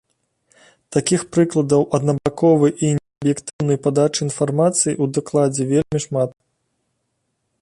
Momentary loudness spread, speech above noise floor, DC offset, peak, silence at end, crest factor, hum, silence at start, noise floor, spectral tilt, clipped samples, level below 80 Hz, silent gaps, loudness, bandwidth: 6 LU; 54 dB; under 0.1%; -4 dBFS; 1.3 s; 16 dB; none; 0.9 s; -72 dBFS; -5.5 dB/octave; under 0.1%; -54 dBFS; 3.53-3.59 s; -19 LUFS; 11.5 kHz